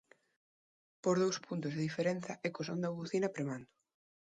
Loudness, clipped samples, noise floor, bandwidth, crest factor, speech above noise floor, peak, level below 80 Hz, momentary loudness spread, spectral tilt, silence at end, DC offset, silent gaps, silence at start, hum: -37 LUFS; under 0.1%; under -90 dBFS; 9.4 kHz; 18 dB; over 54 dB; -20 dBFS; -80 dBFS; 8 LU; -5.5 dB/octave; 0.65 s; under 0.1%; none; 1.05 s; none